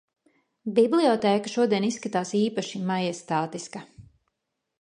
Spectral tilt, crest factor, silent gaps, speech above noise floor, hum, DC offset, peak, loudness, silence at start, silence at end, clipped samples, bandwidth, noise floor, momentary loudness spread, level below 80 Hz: -5.5 dB/octave; 18 dB; none; 56 dB; none; under 0.1%; -8 dBFS; -25 LUFS; 0.65 s; 0.8 s; under 0.1%; 11 kHz; -81 dBFS; 14 LU; -70 dBFS